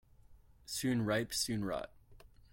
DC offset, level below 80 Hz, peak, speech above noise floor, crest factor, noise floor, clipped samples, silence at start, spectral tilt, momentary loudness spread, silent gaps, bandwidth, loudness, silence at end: under 0.1%; -62 dBFS; -20 dBFS; 25 dB; 18 dB; -61 dBFS; under 0.1%; 0.3 s; -4 dB/octave; 13 LU; none; 16.5 kHz; -36 LUFS; 0.25 s